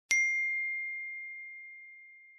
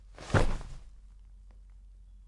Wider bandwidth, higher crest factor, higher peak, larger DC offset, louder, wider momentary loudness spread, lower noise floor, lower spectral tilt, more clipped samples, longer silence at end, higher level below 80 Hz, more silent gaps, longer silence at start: about the same, 11.5 kHz vs 11 kHz; about the same, 26 dB vs 24 dB; about the same, -10 dBFS vs -10 dBFS; neither; about the same, -31 LUFS vs -32 LUFS; second, 22 LU vs 27 LU; about the same, -54 dBFS vs -52 dBFS; second, 3.5 dB/octave vs -6 dB/octave; neither; about the same, 0 s vs 0.1 s; second, -82 dBFS vs -38 dBFS; neither; about the same, 0.1 s vs 0.2 s